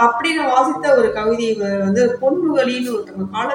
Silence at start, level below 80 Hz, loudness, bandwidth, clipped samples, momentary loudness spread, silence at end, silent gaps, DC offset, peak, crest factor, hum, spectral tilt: 0 s; -52 dBFS; -17 LUFS; 16.5 kHz; under 0.1%; 8 LU; 0 s; none; under 0.1%; 0 dBFS; 16 dB; none; -5 dB/octave